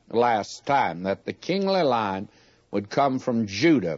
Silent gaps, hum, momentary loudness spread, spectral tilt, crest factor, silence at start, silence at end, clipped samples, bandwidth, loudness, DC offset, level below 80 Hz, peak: none; none; 10 LU; -5.5 dB/octave; 16 dB; 0.1 s; 0 s; under 0.1%; 8 kHz; -24 LUFS; under 0.1%; -66 dBFS; -8 dBFS